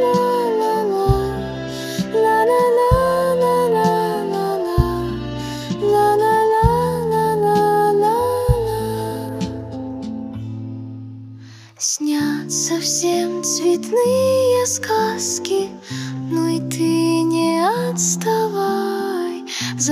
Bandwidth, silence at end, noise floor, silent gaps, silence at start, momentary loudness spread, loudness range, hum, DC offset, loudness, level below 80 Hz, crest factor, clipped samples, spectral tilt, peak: 16 kHz; 0 s; -39 dBFS; none; 0 s; 12 LU; 6 LU; none; under 0.1%; -18 LUFS; -34 dBFS; 18 dB; under 0.1%; -4.5 dB/octave; 0 dBFS